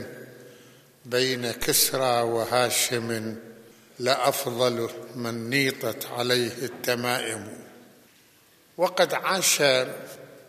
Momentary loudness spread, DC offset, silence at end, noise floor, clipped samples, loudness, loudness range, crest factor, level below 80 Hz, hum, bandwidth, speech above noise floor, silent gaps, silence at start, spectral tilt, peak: 16 LU; under 0.1%; 0.1 s; -58 dBFS; under 0.1%; -24 LUFS; 3 LU; 22 dB; -60 dBFS; none; 15 kHz; 33 dB; none; 0 s; -2.5 dB/octave; -6 dBFS